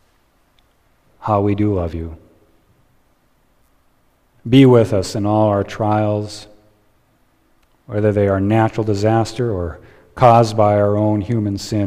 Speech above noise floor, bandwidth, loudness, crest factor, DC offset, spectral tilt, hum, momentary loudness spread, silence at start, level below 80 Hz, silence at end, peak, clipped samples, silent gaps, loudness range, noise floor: 43 dB; 12 kHz; -16 LUFS; 18 dB; under 0.1%; -7.5 dB/octave; none; 15 LU; 1.2 s; -44 dBFS; 0 s; 0 dBFS; under 0.1%; none; 8 LU; -58 dBFS